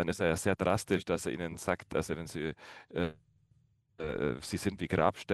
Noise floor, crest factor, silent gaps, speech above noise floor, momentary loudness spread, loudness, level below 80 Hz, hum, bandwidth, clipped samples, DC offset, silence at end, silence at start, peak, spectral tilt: -69 dBFS; 22 dB; none; 36 dB; 9 LU; -34 LUFS; -56 dBFS; none; 13 kHz; under 0.1%; under 0.1%; 0 s; 0 s; -12 dBFS; -5.5 dB/octave